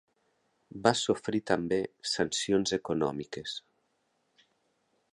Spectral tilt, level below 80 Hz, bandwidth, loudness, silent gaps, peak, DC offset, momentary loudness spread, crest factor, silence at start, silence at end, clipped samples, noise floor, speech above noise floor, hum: -4 dB/octave; -64 dBFS; 11.5 kHz; -30 LUFS; none; -6 dBFS; under 0.1%; 11 LU; 26 dB; 0.75 s; 1.55 s; under 0.1%; -76 dBFS; 45 dB; none